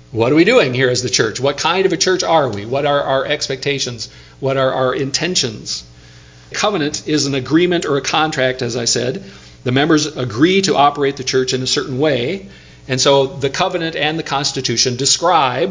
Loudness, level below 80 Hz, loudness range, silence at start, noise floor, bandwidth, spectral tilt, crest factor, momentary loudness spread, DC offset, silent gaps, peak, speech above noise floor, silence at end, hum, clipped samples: -16 LUFS; -48 dBFS; 3 LU; 0.1 s; -41 dBFS; 7.8 kHz; -3.5 dB/octave; 16 dB; 8 LU; under 0.1%; none; 0 dBFS; 25 dB; 0 s; none; under 0.1%